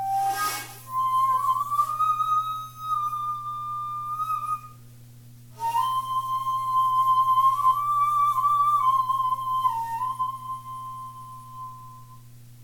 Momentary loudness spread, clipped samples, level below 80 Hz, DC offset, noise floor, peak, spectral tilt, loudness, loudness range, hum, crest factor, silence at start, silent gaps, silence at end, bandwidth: 16 LU; under 0.1%; -62 dBFS; under 0.1%; -47 dBFS; -12 dBFS; -2.5 dB/octave; -24 LUFS; 8 LU; none; 14 dB; 0 s; none; 0 s; 17.5 kHz